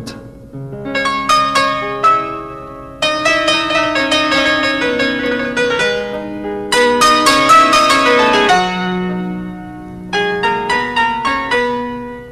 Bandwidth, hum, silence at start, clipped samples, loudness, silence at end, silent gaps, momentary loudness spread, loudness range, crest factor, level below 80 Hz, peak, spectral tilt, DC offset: 13.5 kHz; none; 0 s; under 0.1%; -13 LUFS; 0 s; none; 17 LU; 5 LU; 14 dB; -42 dBFS; 0 dBFS; -3 dB/octave; 0.2%